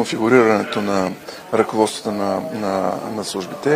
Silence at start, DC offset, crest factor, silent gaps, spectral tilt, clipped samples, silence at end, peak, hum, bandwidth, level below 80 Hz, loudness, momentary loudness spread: 0 s; under 0.1%; 18 dB; none; -5 dB/octave; under 0.1%; 0 s; 0 dBFS; none; 16 kHz; -60 dBFS; -19 LUFS; 11 LU